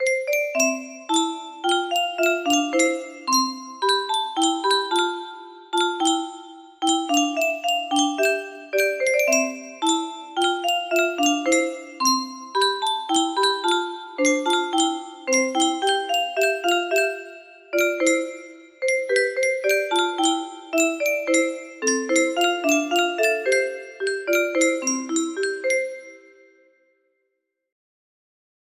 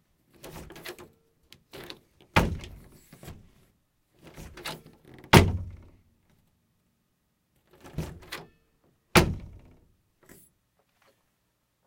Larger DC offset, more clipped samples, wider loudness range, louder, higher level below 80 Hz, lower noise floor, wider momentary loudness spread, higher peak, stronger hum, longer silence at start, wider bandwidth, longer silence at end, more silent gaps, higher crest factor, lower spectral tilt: neither; neither; second, 2 LU vs 7 LU; first, -22 LUFS vs -25 LUFS; second, -72 dBFS vs -44 dBFS; about the same, -77 dBFS vs -75 dBFS; second, 8 LU vs 29 LU; second, -6 dBFS vs 0 dBFS; neither; second, 0 s vs 0.45 s; about the same, 15.5 kHz vs 16.5 kHz; first, 2.55 s vs 2.4 s; neither; second, 18 dB vs 32 dB; second, 0 dB/octave vs -5 dB/octave